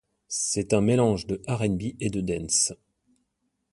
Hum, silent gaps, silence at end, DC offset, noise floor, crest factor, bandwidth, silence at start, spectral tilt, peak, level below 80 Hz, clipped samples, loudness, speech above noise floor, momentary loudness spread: none; none; 1 s; under 0.1%; -77 dBFS; 20 dB; 11.5 kHz; 0.3 s; -4.5 dB/octave; -8 dBFS; -50 dBFS; under 0.1%; -25 LUFS; 51 dB; 8 LU